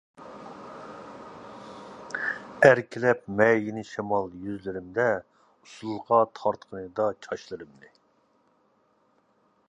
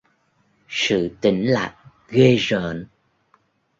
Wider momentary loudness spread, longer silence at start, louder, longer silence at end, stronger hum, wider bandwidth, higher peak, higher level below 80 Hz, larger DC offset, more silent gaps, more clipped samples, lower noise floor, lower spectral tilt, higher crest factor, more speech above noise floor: first, 22 LU vs 14 LU; second, 0.2 s vs 0.7 s; second, -26 LUFS vs -20 LUFS; first, 2.05 s vs 0.95 s; neither; first, 11 kHz vs 7.8 kHz; about the same, -2 dBFS vs -2 dBFS; second, -64 dBFS vs -54 dBFS; neither; neither; neither; about the same, -67 dBFS vs -64 dBFS; about the same, -6 dB/octave vs -5.5 dB/octave; first, 28 dB vs 20 dB; second, 41 dB vs 45 dB